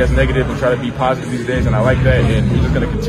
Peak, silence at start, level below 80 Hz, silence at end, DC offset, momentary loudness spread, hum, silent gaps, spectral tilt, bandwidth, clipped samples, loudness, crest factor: 0 dBFS; 0 s; -22 dBFS; 0 s; under 0.1%; 4 LU; none; none; -7.5 dB/octave; 11.5 kHz; under 0.1%; -15 LUFS; 14 dB